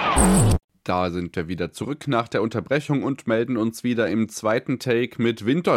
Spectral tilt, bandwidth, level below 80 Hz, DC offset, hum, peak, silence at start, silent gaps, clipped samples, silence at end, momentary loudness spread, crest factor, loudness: -5.5 dB/octave; 16.5 kHz; -36 dBFS; under 0.1%; none; -4 dBFS; 0 s; 0.64-0.68 s; under 0.1%; 0 s; 10 LU; 18 dB; -23 LUFS